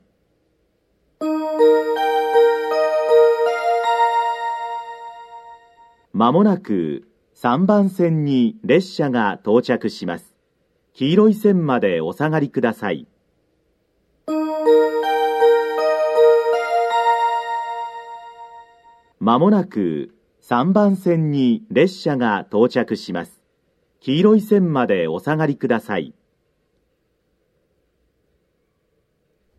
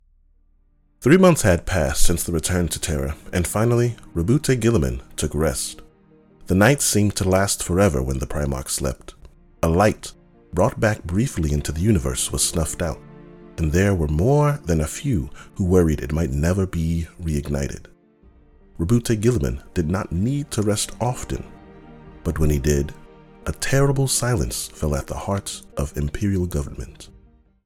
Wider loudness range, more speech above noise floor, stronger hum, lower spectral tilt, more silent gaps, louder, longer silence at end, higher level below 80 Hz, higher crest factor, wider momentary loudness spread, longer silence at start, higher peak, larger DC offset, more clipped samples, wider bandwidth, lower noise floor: about the same, 5 LU vs 4 LU; first, 50 dB vs 38 dB; neither; first, -7.5 dB/octave vs -5.5 dB/octave; neither; first, -18 LUFS vs -21 LUFS; first, 3.5 s vs 0.6 s; second, -68 dBFS vs -32 dBFS; about the same, 18 dB vs 20 dB; first, 14 LU vs 11 LU; first, 1.2 s vs 1 s; about the same, -2 dBFS vs -2 dBFS; neither; neither; second, 13.5 kHz vs 17.5 kHz; first, -67 dBFS vs -59 dBFS